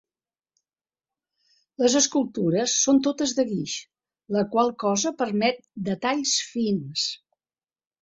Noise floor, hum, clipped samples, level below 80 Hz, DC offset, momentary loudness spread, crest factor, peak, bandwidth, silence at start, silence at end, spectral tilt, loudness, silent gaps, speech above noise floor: under -90 dBFS; none; under 0.1%; -68 dBFS; under 0.1%; 9 LU; 18 dB; -8 dBFS; 8.4 kHz; 1.8 s; 0.85 s; -3.5 dB/octave; -24 LUFS; none; over 66 dB